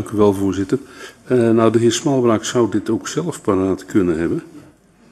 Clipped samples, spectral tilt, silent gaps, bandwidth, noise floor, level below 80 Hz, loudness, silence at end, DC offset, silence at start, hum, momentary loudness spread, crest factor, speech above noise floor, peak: under 0.1%; -5.5 dB/octave; none; 13 kHz; -48 dBFS; -50 dBFS; -18 LUFS; 0.55 s; under 0.1%; 0 s; none; 9 LU; 18 dB; 31 dB; 0 dBFS